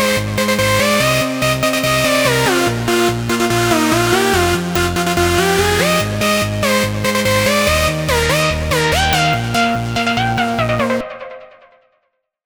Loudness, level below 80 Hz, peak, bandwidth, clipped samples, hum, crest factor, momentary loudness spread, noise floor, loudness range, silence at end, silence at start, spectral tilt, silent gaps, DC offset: -15 LUFS; -32 dBFS; 0 dBFS; over 20 kHz; under 0.1%; none; 14 dB; 4 LU; -67 dBFS; 2 LU; 1 s; 0 s; -4 dB/octave; none; under 0.1%